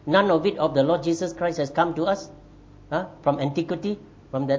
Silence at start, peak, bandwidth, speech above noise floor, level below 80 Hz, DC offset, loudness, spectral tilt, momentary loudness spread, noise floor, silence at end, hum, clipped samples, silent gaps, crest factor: 0.05 s; -4 dBFS; 8 kHz; 25 dB; -54 dBFS; under 0.1%; -24 LUFS; -6 dB/octave; 10 LU; -48 dBFS; 0 s; none; under 0.1%; none; 20 dB